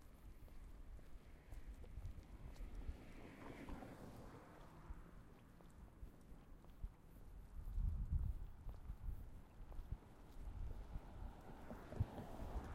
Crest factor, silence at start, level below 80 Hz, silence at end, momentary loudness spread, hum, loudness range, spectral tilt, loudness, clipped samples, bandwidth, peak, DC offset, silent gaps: 22 dB; 0 s; -52 dBFS; 0 s; 16 LU; none; 9 LU; -7.5 dB/octave; -55 LUFS; under 0.1%; 16 kHz; -28 dBFS; under 0.1%; none